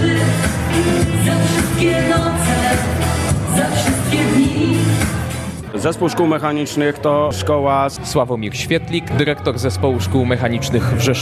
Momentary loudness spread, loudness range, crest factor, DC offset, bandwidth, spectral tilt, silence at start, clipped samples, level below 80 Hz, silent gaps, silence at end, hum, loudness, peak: 4 LU; 2 LU; 14 dB; under 0.1%; 14 kHz; -5.5 dB/octave; 0 s; under 0.1%; -32 dBFS; none; 0 s; none; -17 LUFS; -2 dBFS